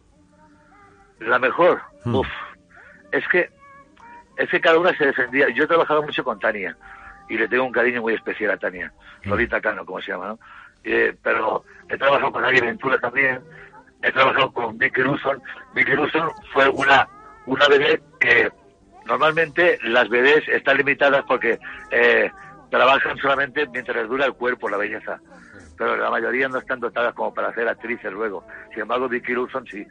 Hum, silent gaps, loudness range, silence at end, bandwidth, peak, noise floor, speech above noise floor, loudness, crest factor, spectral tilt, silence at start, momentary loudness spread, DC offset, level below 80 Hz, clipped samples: none; none; 6 LU; 0.05 s; 9 kHz; -4 dBFS; -54 dBFS; 33 dB; -20 LUFS; 18 dB; -5.5 dB/octave; 1.2 s; 13 LU; under 0.1%; -54 dBFS; under 0.1%